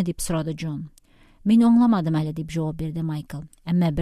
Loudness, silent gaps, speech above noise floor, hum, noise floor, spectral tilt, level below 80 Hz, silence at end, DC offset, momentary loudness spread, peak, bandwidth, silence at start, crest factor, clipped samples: -23 LUFS; none; 32 dB; none; -53 dBFS; -7 dB/octave; -46 dBFS; 0 s; under 0.1%; 17 LU; -8 dBFS; 14 kHz; 0 s; 14 dB; under 0.1%